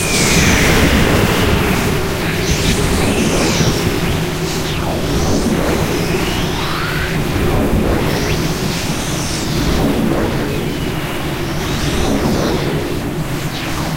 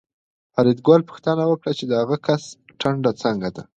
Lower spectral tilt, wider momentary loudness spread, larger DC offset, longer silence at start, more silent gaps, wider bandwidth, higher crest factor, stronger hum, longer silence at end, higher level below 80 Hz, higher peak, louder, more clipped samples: second, -4.5 dB/octave vs -7 dB/octave; about the same, 8 LU vs 9 LU; first, 2% vs under 0.1%; second, 0 s vs 0.55 s; neither; first, 16 kHz vs 8.8 kHz; about the same, 16 dB vs 18 dB; neither; second, 0 s vs 0.15 s; first, -24 dBFS vs -60 dBFS; about the same, 0 dBFS vs -2 dBFS; first, -16 LUFS vs -20 LUFS; neither